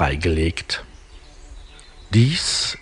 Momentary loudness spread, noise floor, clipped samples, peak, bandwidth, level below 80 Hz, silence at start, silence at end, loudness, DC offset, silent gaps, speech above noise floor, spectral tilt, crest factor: 10 LU; -43 dBFS; under 0.1%; -4 dBFS; 11 kHz; -36 dBFS; 0 s; 0 s; -20 LUFS; under 0.1%; none; 23 dB; -4.5 dB/octave; 18 dB